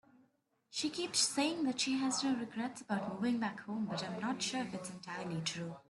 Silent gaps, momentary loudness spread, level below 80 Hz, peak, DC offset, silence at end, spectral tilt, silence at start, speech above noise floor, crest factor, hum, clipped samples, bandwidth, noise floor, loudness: none; 10 LU; -78 dBFS; -18 dBFS; under 0.1%; 0.1 s; -3 dB/octave; 0.7 s; 38 dB; 20 dB; none; under 0.1%; 12 kHz; -76 dBFS; -37 LUFS